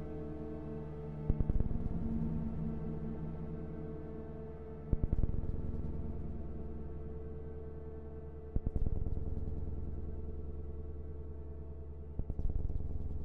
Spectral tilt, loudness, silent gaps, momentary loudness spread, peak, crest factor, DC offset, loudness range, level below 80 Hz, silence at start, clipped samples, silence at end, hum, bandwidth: -11.5 dB/octave; -42 LUFS; none; 10 LU; -16 dBFS; 22 dB; under 0.1%; 5 LU; -40 dBFS; 0 s; under 0.1%; 0 s; none; 2.8 kHz